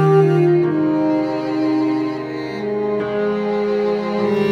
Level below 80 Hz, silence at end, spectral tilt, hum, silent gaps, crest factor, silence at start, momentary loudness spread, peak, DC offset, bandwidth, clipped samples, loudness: -58 dBFS; 0 s; -8.5 dB/octave; none; none; 14 dB; 0 s; 9 LU; -4 dBFS; under 0.1%; 7.2 kHz; under 0.1%; -18 LUFS